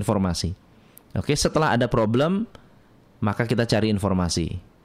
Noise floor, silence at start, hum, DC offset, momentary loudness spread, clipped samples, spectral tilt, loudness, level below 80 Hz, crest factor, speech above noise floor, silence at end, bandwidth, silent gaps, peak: -54 dBFS; 0 s; none; under 0.1%; 11 LU; under 0.1%; -5.5 dB/octave; -23 LUFS; -44 dBFS; 18 dB; 32 dB; 0.25 s; 15 kHz; none; -6 dBFS